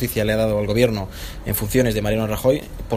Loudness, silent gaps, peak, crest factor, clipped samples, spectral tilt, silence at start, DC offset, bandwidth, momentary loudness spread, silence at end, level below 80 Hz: -20 LUFS; none; -2 dBFS; 18 dB; under 0.1%; -5.5 dB/octave; 0 s; under 0.1%; 15.5 kHz; 8 LU; 0 s; -34 dBFS